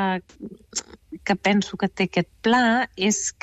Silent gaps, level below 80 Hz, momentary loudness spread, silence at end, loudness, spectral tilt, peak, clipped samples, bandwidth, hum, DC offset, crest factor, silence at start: none; -56 dBFS; 14 LU; 0.1 s; -23 LUFS; -3.5 dB/octave; -10 dBFS; under 0.1%; 13.5 kHz; none; under 0.1%; 14 dB; 0 s